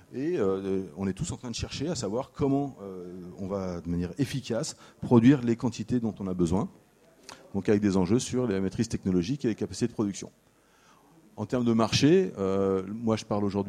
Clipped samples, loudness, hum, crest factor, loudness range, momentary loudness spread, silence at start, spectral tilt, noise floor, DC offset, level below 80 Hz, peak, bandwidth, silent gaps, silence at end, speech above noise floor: under 0.1%; -28 LUFS; none; 20 dB; 5 LU; 14 LU; 0.1 s; -6 dB/octave; -61 dBFS; under 0.1%; -54 dBFS; -8 dBFS; 13 kHz; none; 0 s; 33 dB